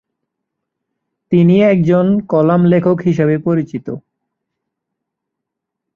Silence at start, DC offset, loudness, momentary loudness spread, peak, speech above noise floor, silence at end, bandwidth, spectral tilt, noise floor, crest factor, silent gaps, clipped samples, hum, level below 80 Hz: 1.3 s; under 0.1%; -13 LUFS; 13 LU; -2 dBFS; 67 dB; 1.95 s; 6.6 kHz; -9.5 dB/octave; -79 dBFS; 14 dB; none; under 0.1%; none; -54 dBFS